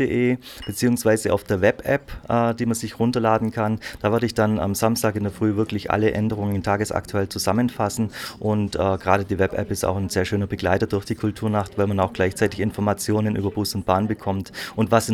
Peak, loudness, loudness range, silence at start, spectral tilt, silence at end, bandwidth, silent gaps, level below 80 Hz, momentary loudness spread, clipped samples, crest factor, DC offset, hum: -2 dBFS; -23 LUFS; 1 LU; 0 s; -6 dB/octave; 0 s; 16.5 kHz; none; -46 dBFS; 5 LU; under 0.1%; 20 dB; under 0.1%; none